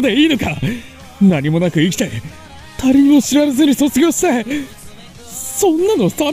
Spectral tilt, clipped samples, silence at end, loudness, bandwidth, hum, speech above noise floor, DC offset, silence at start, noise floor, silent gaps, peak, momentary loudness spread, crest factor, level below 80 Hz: -5 dB/octave; under 0.1%; 0 s; -14 LUFS; 16 kHz; none; 22 dB; under 0.1%; 0 s; -35 dBFS; none; -2 dBFS; 16 LU; 12 dB; -42 dBFS